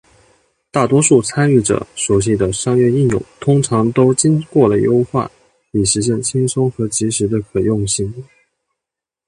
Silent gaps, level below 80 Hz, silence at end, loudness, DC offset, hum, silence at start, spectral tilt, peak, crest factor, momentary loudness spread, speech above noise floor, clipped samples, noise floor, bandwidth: none; -42 dBFS; 1.05 s; -15 LUFS; under 0.1%; none; 0.75 s; -5.5 dB/octave; 0 dBFS; 16 dB; 7 LU; 70 dB; under 0.1%; -84 dBFS; 11.5 kHz